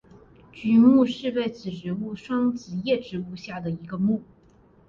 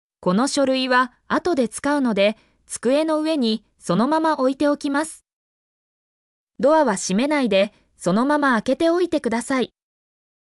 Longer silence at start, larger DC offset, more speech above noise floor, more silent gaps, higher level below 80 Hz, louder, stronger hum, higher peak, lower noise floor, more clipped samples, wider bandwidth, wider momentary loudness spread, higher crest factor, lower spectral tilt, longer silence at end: first, 0.55 s vs 0.2 s; neither; second, 33 dB vs over 70 dB; second, none vs 5.33-6.47 s; about the same, -60 dBFS vs -60 dBFS; second, -24 LUFS vs -20 LUFS; neither; about the same, -6 dBFS vs -6 dBFS; second, -56 dBFS vs under -90 dBFS; neither; second, 7 kHz vs 12 kHz; first, 16 LU vs 6 LU; about the same, 18 dB vs 14 dB; first, -7.5 dB/octave vs -4.5 dB/octave; second, 0.65 s vs 0.85 s